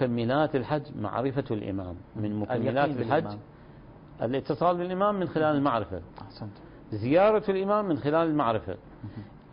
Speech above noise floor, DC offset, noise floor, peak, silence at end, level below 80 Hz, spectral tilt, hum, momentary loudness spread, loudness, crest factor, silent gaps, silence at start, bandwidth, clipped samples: 22 dB; under 0.1%; -49 dBFS; -10 dBFS; 0.15 s; -54 dBFS; -11 dB/octave; none; 17 LU; -27 LUFS; 18 dB; none; 0 s; 5.4 kHz; under 0.1%